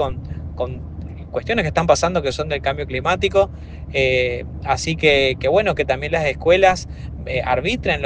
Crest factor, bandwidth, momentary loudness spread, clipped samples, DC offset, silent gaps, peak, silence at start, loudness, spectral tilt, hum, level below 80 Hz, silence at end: 20 dB; 9.8 kHz; 14 LU; under 0.1%; under 0.1%; none; 0 dBFS; 0 s; -19 LUFS; -4.5 dB/octave; none; -36 dBFS; 0 s